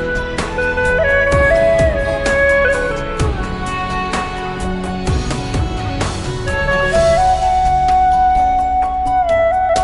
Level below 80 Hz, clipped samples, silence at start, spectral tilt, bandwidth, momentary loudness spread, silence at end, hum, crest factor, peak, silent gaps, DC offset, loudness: -24 dBFS; under 0.1%; 0 s; -5 dB/octave; 11.5 kHz; 9 LU; 0 s; none; 12 dB; -2 dBFS; none; under 0.1%; -15 LUFS